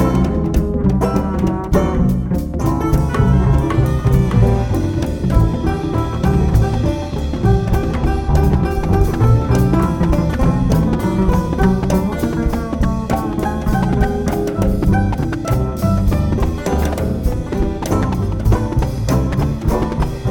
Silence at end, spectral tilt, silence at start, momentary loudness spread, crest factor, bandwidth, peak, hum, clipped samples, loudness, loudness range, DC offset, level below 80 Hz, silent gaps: 0 s; -8 dB/octave; 0 s; 5 LU; 14 dB; 17.5 kHz; 0 dBFS; none; under 0.1%; -17 LUFS; 3 LU; under 0.1%; -20 dBFS; none